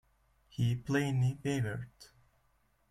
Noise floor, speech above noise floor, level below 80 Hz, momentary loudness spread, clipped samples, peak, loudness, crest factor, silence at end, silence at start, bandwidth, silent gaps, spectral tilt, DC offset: -72 dBFS; 40 dB; -62 dBFS; 14 LU; under 0.1%; -18 dBFS; -34 LUFS; 18 dB; 0.85 s; 0.6 s; 13 kHz; none; -6.5 dB/octave; under 0.1%